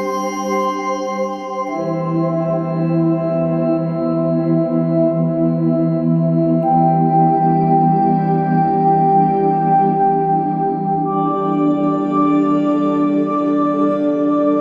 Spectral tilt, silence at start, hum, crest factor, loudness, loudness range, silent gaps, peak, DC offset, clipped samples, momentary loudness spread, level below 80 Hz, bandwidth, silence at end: -9 dB/octave; 0 s; none; 12 dB; -16 LUFS; 4 LU; none; -4 dBFS; under 0.1%; under 0.1%; 6 LU; -56 dBFS; 6.6 kHz; 0 s